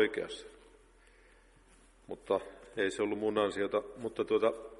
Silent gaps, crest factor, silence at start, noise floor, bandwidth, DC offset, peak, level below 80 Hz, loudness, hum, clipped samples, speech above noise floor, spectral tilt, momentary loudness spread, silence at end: none; 20 dB; 0 s; -62 dBFS; 11.5 kHz; under 0.1%; -16 dBFS; -64 dBFS; -34 LUFS; none; under 0.1%; 28 dB; -4.5 dB/octave; 16 LU; 0 s